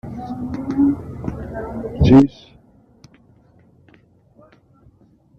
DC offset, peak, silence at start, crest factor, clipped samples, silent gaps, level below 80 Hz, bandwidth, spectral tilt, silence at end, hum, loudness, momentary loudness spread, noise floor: under 0.1%; -2 dBFS; 0.05 s; 18 dB; under 0.1%; none; -38 dBFS; 6.4 kHz; -9 dB/octave; 3.1 s; none; -18 LUFS; 18 LU; -53 dBFS